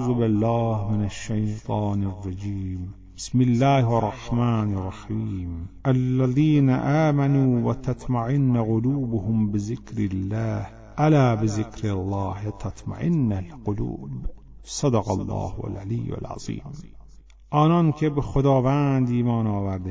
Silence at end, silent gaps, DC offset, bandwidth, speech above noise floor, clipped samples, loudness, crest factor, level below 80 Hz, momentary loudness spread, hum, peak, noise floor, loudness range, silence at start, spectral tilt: 0 s; none; under 0.1%; 8 kHz; 24 dB; under 0.1%; -24 LUFS; 16 dB; -42 dBFS; 13 LU; none; -8 dBFS; -47 dBFS; 6 LU; 0 s; -8 dB/octave